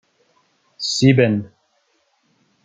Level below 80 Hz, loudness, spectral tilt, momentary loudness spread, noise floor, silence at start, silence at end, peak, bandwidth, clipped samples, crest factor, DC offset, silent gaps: -58 dBFS; -17 LUFS; -5.5 dB/octave; 14 LU; -65 dBFS; 0.8 s; 1.2 s; -2 dBFS; 9.4 kHz; under 0.1%; 20 dB; under 0.1%; none